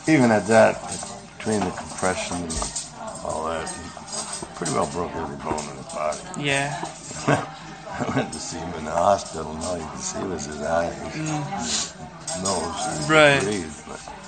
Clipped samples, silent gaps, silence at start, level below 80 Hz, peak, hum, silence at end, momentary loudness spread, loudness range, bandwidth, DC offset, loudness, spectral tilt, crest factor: under 0.1%; none; 0 s; -48 dBFS; -2 dBFS; none; 0 s; 15 LU; 6 LU; 13.5 kHz; under 0.1%; -24 LUFS; -4 dB/octave; 22 dB